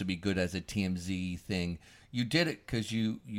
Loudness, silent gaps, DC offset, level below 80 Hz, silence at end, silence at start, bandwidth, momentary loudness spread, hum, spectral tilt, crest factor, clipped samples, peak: -34 LUFS; none; under 0.1%; -56 dBFS; 0 s; 0 s; 16 kHz; 7 LU; none; -5.5 dB/octave; 22 dB; under 0.1%; -12 dBFS